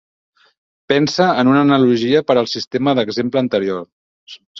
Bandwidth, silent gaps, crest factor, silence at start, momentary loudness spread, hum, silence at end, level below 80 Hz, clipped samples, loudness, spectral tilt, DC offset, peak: 7.4 kHz; 3.92-4.27 s, 4.46-4.55 s; 16 dB; 0.9 s; 7 LU; none; 0 s; -58 dBFS; under 0.1%; -15 LUFS; -6 dB/octave; under 0.1%; -2 dBFS